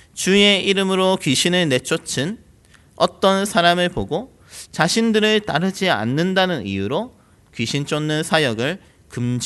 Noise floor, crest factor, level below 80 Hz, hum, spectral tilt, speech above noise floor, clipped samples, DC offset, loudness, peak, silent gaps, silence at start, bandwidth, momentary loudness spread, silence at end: -51 dBFS; 20 dB; -50 dBFS; none; -4 dB/octave; 32 dB; under 0.1%; under 0.1%; -18 LUFS; 0 dBFS; none; 0.15 s; 12.5 kHz; 12 LU; 0 s